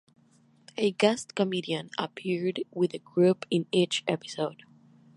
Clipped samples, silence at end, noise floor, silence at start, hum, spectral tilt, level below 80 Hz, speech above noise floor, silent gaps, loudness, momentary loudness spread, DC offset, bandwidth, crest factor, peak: under 0.1%; 0.6 s; -62 dBFS; 0.75 s; none; -5 dB/octave; -76 dBFS; 34 dB; none; -28 LUFS; 9 LU; under 0.1%; 11.5 kHz; 22 dB; -6 dBFS